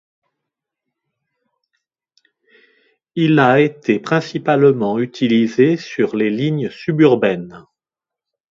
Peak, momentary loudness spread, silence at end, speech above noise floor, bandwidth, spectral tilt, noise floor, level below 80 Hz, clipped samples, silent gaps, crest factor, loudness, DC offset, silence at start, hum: 0 dBFS; 8 LU; 0.95 s; 72 dB; 7.6 kHz; -7.5 dB/octave; -88 dBFS; -62 dBFS; under 0.1%; none; 18 dB; -16 LUFS; under 0.1%; 3.15 s; none